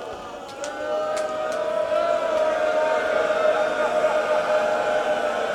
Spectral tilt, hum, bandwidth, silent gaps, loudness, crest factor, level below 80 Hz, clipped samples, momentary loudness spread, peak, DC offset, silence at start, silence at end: -3 dB/octave; none; 12.5 kHz; none; -23 LUFS; 14 dB; -60 dBFS; under 0.1%; 9 LU; -10 dBFS; under 0.1%; 0 s; 0 s